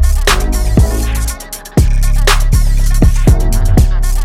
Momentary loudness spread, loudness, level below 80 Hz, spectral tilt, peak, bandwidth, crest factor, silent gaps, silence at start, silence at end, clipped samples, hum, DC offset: 5 LU; -13 LUFS; -10 dBFS; -5 dB/octave; 0 dBFS; 15.5 kHz; 8 dB; none; 0 s; 0 s; under 0.1%; none; under 0.1%